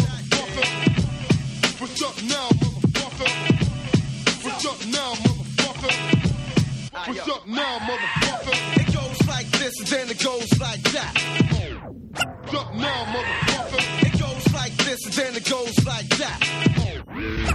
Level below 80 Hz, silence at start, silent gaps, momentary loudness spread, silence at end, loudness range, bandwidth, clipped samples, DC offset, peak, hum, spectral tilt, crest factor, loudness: -40 dBFS; 0 s; none; 6 LU; 0 s; 2 LU; 14 kHz; under 0.1%; under 0.1%; -2 dBFS; none; -4.5 dB/octave; 22 dB; -22 LUFS